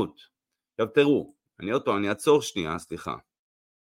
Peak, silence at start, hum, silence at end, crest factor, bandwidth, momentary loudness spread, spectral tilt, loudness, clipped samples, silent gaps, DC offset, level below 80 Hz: -8 dBFS; 0 s; none; 0.75 s; 20 dB; 16 kHz; 16 LU; -5 dB/octave; -26 LUFS; under 0.1%; none; under 0.1%; -62 dBFS